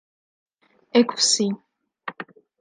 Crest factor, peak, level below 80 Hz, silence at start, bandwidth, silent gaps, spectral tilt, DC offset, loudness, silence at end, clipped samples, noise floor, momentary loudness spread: 22 dB; -4 dBFS; -78 dBFS; 0.95 s; 10 kHz; none; -2.5 dB/octave; under 0.1%; -20 LUFS; 0.4 s; under 0.1%; -42 dBFS; 20 LU